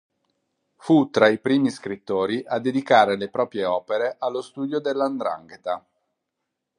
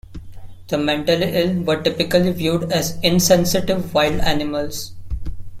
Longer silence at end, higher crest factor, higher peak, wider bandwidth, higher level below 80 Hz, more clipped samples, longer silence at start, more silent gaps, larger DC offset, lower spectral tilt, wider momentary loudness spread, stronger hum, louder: first, 1 s vs 0 s; about the same, 22 dB vs 18 dB; about the same, -2 dBFS vs -2 dBFS; second, 11 kHz vs 16.5 kHz; second, -68 dBFS vs -34 dBFS; neither; first, 0.85 s vs 0.1 s; neither; neither; first, -6 dB/octave vs -4.5 dB/octave; about the same, 13 LU vs 15 LU; neither; second, -23 LUFS vs -18 LUFS